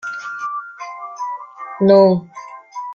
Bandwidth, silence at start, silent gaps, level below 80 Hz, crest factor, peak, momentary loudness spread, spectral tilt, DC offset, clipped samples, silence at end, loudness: 7.2 kHz; 0.05 s; none; -62 dBFS; 16 dB; -2 dBFS; 22 LU; -7.5 dB/octave; under 0.1%; under 0.1%; 0 s; -17 LUFS